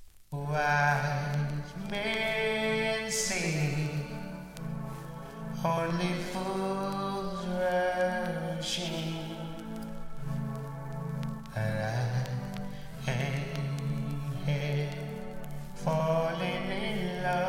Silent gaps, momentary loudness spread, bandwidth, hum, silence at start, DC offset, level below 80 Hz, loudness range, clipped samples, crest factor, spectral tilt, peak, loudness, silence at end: none; 12 LU; 16.5 kHz; none; 0 s; under 0.1%; -50 dBFS; 5 LU; under 0.1%; 18 dB; -5 dB/octave; -14 dBFS; -32 LUFS; 0 s